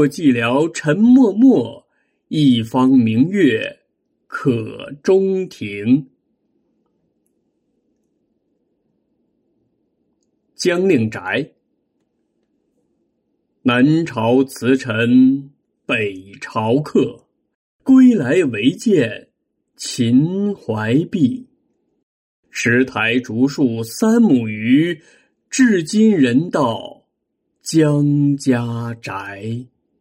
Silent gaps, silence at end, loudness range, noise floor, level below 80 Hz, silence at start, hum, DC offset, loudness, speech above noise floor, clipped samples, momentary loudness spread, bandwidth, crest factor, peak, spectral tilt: 17.55-17.79 s, 22.03-22.43 s; 0.35 s; 7 LU; -72 dBFS; -62 dBFS; 0 s; none; under 0.1%; -16 LUFS; 57 dB; under 0.1%; 14 LU; 15.5 kHz; 16 dB; -2 dBFS; -6 dB/octave